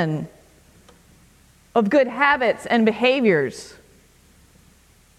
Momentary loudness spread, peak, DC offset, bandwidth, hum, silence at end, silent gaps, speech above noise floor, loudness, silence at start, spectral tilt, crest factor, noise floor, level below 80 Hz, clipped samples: 17 LU; -4 dBFS; under 0.1%; 13 kHz; none; 1.5 s; none; 35 dB; -19 LUFS; 0 s; -6 dB/octave; 18 dB; -54 dBFS; -58 dBFS; under 0.1%